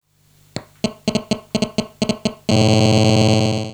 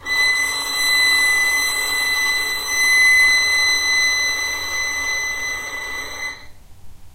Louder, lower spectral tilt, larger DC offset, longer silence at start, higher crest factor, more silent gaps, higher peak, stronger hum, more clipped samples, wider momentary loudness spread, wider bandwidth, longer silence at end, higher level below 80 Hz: about the same, -18 LUFS vs -16 LUFS; first, -5.5 dB/octave vs 1.5 dB/octave; neither; first, 0.55 s vs 0 s; about the same, 16 dB vs 14 dB; neither; first, -2 dBFS vs -6 dBFS; neither; neither; about the same, 13 LU vs 14 LU; second, 12 kHz vs 16 kHz; about the same, 0 s vs 0 s; about the same, -46 dBFS vs -46 dBFS